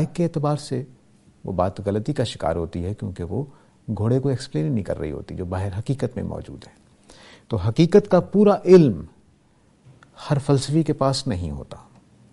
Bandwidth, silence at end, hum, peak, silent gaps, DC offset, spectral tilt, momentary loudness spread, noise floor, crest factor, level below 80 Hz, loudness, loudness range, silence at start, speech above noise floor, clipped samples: 11.5 kHz; 0.5 s; none; -2 dBFS; none; under 0.1%; -7.5 dB/octave; 17 LU; -58 dBFS; 20 dB; -46 dBFS; -22 LUFS; 8 LU; 0 s; 37 dB; under 0.1%